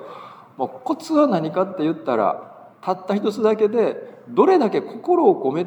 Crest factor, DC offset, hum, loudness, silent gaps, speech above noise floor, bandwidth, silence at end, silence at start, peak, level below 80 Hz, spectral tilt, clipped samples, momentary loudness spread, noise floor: 18 dB; under 0.1%; none; -20 LUFS; none; 21 dB; 11.5 kHz; 0 s; 0 s; -2 dBFS; -82 dBFS; -7 dB/octave; under 0.1%; 13 LU; -40 dBFS